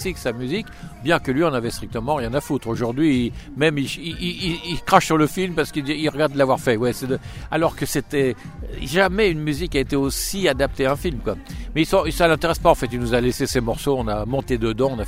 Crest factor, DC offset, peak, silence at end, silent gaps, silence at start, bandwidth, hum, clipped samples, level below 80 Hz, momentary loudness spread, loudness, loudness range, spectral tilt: 20 dB; under 0.1%; 0 dBFS; 0 s; none; 0 s; 16 kHz; none; under 0.1%; -36 dBFS; 9 LU; -21 LUFS; 2 LU; -5 dB/octave